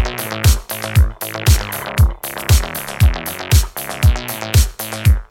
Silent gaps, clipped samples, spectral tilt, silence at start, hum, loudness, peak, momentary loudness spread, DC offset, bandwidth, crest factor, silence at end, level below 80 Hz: none; under 0.1%; -4.5 dB/octave; 0 s; none; -17 LUFS; 0 dBFS; 6 LU; under 0.1%; 18 kHz; 14 dB; 0.05 s; -18 dBFS